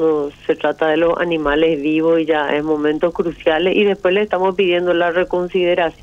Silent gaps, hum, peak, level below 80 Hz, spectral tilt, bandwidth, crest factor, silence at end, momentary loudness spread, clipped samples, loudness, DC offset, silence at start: none; none; -2 dBFS; -44 dBFS; -6.5 dB/octave; 7.8 kHz; 14 dB; 0.1 s; 4 LU; under 0.1%; -17 LUFS; under 0.1%; 0 s